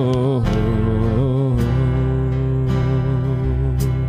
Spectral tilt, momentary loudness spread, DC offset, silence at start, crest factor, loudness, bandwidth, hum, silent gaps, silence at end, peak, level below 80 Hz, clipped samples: -9 dB/octave; 2 LU; under 0.1%; 0 s; 12 dB; -19 LUFS; 9.6 kHz; none; none; 0 s; -6 dBFS; -26 dBFS; under 0.1%